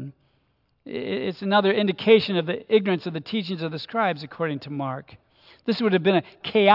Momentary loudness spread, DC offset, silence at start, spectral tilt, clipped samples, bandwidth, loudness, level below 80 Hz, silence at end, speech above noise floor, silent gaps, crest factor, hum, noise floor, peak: 13 LU; under 0.1%; 0 s; -8 dB/octave; under 0.1%; 5.8 kHz; -24 LUFS; -70 dBFS; 0 s; 45 dB; none; 20 dB; none; -68 dBFS; -2 dBFS